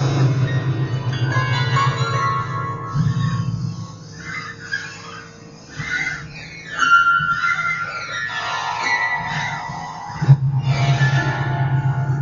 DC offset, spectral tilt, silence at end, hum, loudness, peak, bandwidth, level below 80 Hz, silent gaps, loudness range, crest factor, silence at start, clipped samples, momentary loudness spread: under 0.1%; -5.5 dB/octave; 0 s; none; -20 LUFS; -2 dBFS; 7.4 kHz; -46 dBFS; none; 7 LU; 18 dB; 0 s; under 0.1%; 15 LU